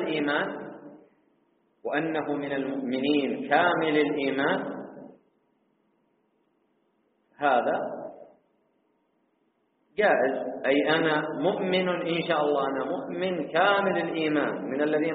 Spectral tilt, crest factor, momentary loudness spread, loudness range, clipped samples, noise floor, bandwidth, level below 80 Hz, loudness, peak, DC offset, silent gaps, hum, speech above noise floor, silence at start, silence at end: -3 dB/octave; 20 dB; 12 LU; 7 LU; under 0.1%; -71 dBFS; 4.6 kHz; -74 dBFS; -26 LUFS; -8 dBFS; under 0.1%; none; none; 46 dB; 0 s; 0 s